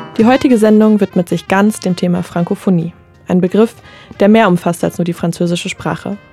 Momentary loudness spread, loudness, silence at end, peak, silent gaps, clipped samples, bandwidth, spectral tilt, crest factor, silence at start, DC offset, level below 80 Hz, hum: 9 LU; -13 LUFS; 0.15 s; 0 dBFS; none; under 0.1%; 14 kHz; -6.5 dB/octave; 12 dB; 0 s; under 0.1%; -50 dBFS; none